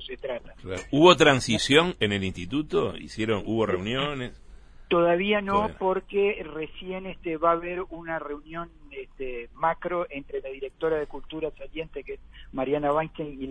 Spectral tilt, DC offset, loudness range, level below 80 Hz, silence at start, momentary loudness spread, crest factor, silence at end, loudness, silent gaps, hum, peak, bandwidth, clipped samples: -5 dB/octave; under 0.1%; 9 LU; -48 dBFS; 0 s; 17 LU; 24 dB; 0 s; -26 LUFS; none; none; -2 dBFS; 10.5 kHz; under 0.1%